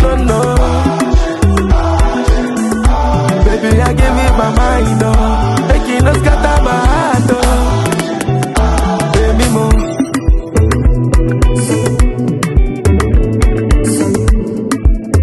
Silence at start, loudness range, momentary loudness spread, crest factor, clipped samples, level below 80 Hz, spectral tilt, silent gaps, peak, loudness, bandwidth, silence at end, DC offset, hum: 0 s; 1 LU; 3 LU; 10 dB; under 0.1%; -14 dBFS; -6 dB/octave; none; 0 dBFS; -12 LUFS; 12.5 kHz; 0 s; under 0.1%; none